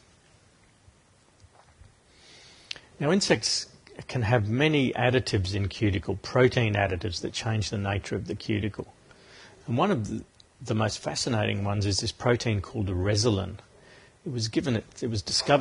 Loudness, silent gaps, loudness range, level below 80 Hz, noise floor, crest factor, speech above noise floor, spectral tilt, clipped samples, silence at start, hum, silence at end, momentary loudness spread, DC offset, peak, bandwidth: -27 LUFS; none; 5 LU; -46 dBFS; -61 dBFS; 22 dB; 34 dB; -5 dB/octave; under 0.1%; 2.35 s; none; 0 s; 15 LU; under 0.1%; -6 dBFS; 11 kHz